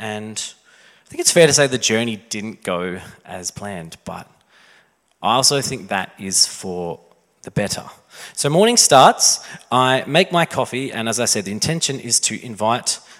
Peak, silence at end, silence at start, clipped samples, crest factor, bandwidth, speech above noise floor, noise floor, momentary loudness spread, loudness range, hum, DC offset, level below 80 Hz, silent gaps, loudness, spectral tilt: 0 dBFS; 0.2 s; 0 s; under 0.1%; 20 dB; 16.5 kHz; 37 dB; -56 dBFS; 19 LU; 7 LU; none; under 0.1%; -58 dBFS; none; -17 LUFS; -2.5 dB/octave